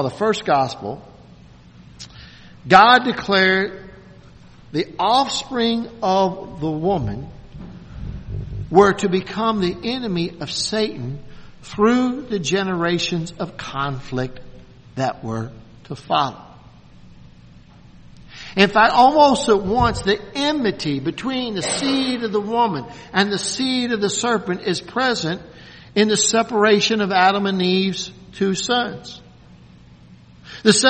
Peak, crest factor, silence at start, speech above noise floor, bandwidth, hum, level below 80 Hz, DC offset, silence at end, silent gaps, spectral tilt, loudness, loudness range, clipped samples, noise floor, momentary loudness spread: 0 dBFS; 20 dB; 0 s; 27 dB; 8.8 kHz; none; -44 dBFS; under 0.1%; 0 s; none; -4 dB/octave; -19 LUFS; 8 LU; under 0.1%; -45 dBFS; 19 LU